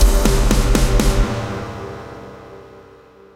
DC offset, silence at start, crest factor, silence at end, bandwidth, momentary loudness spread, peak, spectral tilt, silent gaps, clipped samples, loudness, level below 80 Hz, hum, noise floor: under 0.1%; 0 s; 14 dB; 0.7 s; 16 kHz; 21 LU; -2 dBFS; -5 dB/octave; none; under 0.1%; -18 LUFS; -18 dBFS; none; -44 dBFS